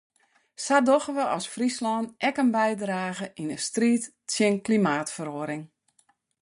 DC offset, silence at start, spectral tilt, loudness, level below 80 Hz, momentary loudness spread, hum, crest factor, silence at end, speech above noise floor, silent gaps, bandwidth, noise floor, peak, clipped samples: under 0.1%; 0.6 s; -4.5 dB/octave; -26 LUFS; -72 dBFS; 10 LU; none; 20 dB; 0.75 s; 42 dB; none; 11.5 kHz; -67 dBFS; -8 dBFS; under 0.1%